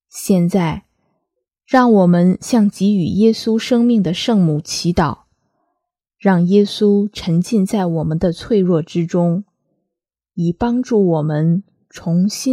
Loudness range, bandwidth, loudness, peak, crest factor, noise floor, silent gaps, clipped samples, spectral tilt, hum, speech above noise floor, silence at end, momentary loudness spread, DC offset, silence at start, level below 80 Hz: 4 LU; 14.5 kHz; -16 LUFS; 0 dBFS; 16 dB; -81 dBFS; none; under 0.1%; -6.5 dB/octave; none; 66 dB; 0 s; 7 LU; under 0.1%; 0.15 s; -46 dBFS